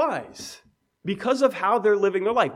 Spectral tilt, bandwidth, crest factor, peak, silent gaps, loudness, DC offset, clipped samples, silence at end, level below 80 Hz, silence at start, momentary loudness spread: -5 dB/octave; 14 kHz; 16 dB; -6 dBFS; none; -23 LUFS; under 0.1%; under 0.1%; 0 s; -68 dBFS; 0 s; 17 LU